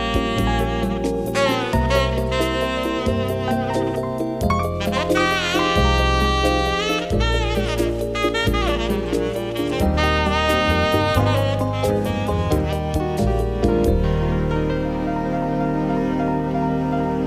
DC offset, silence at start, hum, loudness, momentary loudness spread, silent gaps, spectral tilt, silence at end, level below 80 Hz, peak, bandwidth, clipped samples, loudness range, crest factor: under 0.1%; 0 s; none; -20 LUFS; 5 LU; none; -6 dB/octave; 0 s; -28 dBFS; -4 dBFS; 15.5 kHz; under 0.1%; 2 LU; 16 dB